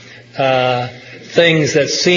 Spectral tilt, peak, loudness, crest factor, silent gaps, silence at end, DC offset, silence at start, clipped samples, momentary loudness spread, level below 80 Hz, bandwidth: -4 dB/octave; 0 dBFS; -14 LUFS; 14 dB; none; 0 s; under 0.1%; 0.1 s; under 0.1%; 17 LU; -56 dBFS; 7.4 kHz